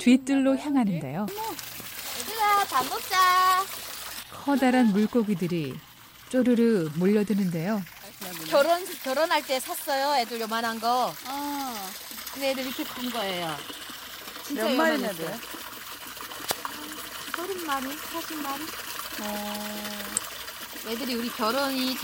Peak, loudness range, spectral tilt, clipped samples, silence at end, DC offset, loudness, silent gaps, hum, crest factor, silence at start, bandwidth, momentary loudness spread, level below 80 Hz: -6 dBFS; 8 LU; -4 dB/octave; under 0.1%; 0 s; under 0.1%; -27 LUFS; none; none; 20 dB; 0 s; 17 kHz; 14 LU; -64 dBFS